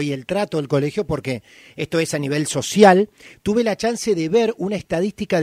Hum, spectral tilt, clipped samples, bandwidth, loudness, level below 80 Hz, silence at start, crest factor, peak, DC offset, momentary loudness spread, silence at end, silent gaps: none; -5 dB/octave; under 0.1%; 15.5 kHz; -20 LUFS; -50 dBFS; 0 s; 20 dB; 0 dBFS; under 0.1%; 13 LU; 0 s; none